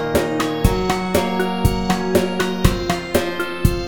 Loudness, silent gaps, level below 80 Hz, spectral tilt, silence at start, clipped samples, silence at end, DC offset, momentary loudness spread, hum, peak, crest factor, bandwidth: -19 LUFS; none; -28 dBFS; -5.5 dB/octave; 0 s; under 0.1%; 0 s; under 0.1%; 2 LU; none; 0 dBFS; 18 dB; over 20 kHz